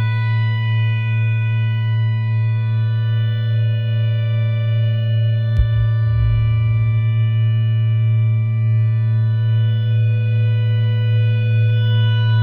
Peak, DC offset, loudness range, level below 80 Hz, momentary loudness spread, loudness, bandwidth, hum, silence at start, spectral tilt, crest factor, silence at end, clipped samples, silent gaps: -4 dBFS; under 0.1%; 2 LU; -34 dBFS; 2 LU; -17 LUFS; 4.2 kHz; none; 0 s; -9.5 dB/octave; 12 dB; 0 s; under 0.1%; none